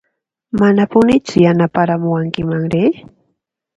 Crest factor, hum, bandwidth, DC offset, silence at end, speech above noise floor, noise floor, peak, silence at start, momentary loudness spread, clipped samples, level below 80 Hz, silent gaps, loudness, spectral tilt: 14 dB; none; 10.5 kHz; under 0.1%; 0.75 s; 58 dB; -71 dBFS; 0 dBFS; 0.55 s; 7 LU; under 0.1%; -46 dBFS; none; -14 LUFS; -7.5 dB/octave